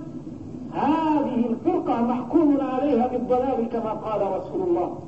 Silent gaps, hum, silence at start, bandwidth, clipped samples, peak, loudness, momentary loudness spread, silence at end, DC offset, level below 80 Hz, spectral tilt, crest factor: none; none; 0 s; 7.8 kHz; under 0.1%; -8 dBFS; -23 LUFS; 9 LU; 0 s; 0.3%; -52 dBFS; -8.5 dB/octave; 14 dB